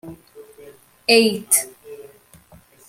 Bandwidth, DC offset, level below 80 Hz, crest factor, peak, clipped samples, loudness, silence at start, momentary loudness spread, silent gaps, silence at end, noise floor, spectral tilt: 16.5 kHz; under 0.1%; -62 dBFS; 22 dB; 0 dBFS; under 0.1%; -17 LUFS; 0.05 s; 25 LU; none; 0.85 s; -50 dBFS; -1.5 dB/octave